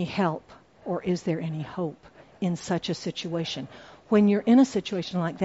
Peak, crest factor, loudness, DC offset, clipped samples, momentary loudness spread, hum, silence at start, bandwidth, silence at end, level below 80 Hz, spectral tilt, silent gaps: -10 dBFS; 16 dB; -26 LUFS; under 0.1%; under 0.1%; 14 LU; none; 0 s; 8 kHz; 0 s; -62 dBFS; -6 dB/octave; none